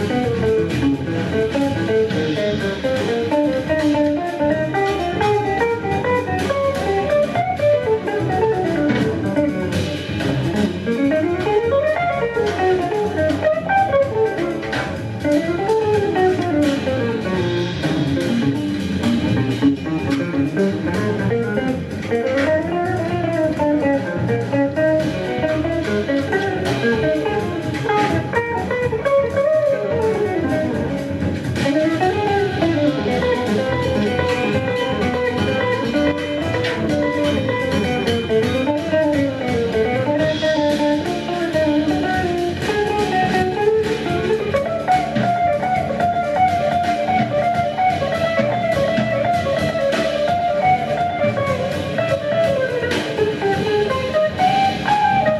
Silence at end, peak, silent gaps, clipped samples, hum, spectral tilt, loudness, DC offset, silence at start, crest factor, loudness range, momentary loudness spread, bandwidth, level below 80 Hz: 0 s; -4 dBFS; none; under 0.1%; none; -6.5 dB/octave; -19 LUFS; under 0.1%; 0 s; 14 dB; 1 LU; 4 LU; 13.5 kHz; -44 dBFS